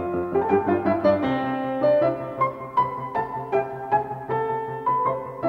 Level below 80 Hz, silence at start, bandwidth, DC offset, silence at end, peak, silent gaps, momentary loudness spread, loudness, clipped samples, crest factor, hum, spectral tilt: -56 dBFS; 0 s; 6 kHz; under 0.1%; 0 s; -8 dBFS; none; 6 LU; -24 LUFS; under 0.1%; 16 dB; none; -9 dB/octave